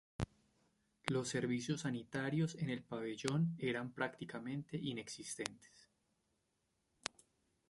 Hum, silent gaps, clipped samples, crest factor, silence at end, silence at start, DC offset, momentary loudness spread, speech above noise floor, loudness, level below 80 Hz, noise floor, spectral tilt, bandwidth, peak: none; none; under 0.1%; 28 dB; 2.05 s; 0.2 s; under 0.1%; 9 LU; 43 dB; -42 LUFS; -68 dBFS; -84 dBFS; -5 dB/octave; 11.5 kHz; -14 dBFS